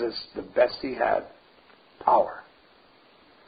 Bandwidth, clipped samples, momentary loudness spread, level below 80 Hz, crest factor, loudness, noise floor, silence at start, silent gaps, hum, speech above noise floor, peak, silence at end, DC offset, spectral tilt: 5 kHz; under 0.1%; 14 LU; -62 dBFS; 22 dB; -26 LUFS; -57 dBFS; 0 s; none; none; 32 dB; -6 dBFS; 1.05 s; under 0.1%; -8 dB/octave